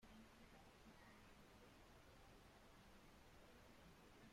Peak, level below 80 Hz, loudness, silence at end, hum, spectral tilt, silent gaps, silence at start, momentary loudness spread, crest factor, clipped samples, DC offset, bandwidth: -54 dBFS; -74 dBFS; -67 LUFS; 0 s; none; -4.5 dB/octave; none; 0 s; 1 LU; 12 dB; under 0.1%; under 0.1%; 16 kHz